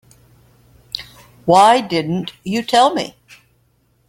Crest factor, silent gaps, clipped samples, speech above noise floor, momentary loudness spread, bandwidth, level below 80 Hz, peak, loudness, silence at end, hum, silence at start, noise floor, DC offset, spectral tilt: 18 dB; none; under 0.1%; 45 dB; 18 LU; 16.5 kHz; -56 dBFS; 0 dBFS; -15 LUFS; 1 s; none; 0.95 s; -60 dBFS; under 0.1%; -4.5 dB/octave